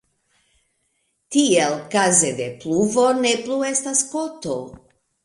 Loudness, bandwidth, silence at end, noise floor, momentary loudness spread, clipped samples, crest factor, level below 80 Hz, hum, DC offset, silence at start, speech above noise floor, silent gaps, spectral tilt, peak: -19 LUFS; 11.5 kHz; 0.5 s; -70 dBFS; 12 LU; under 0.1%; 18 dB; -62 dBFS; none; under 0.1%; 1.3 s; 50 dB; none; -3 dB/octave; -4 dBFS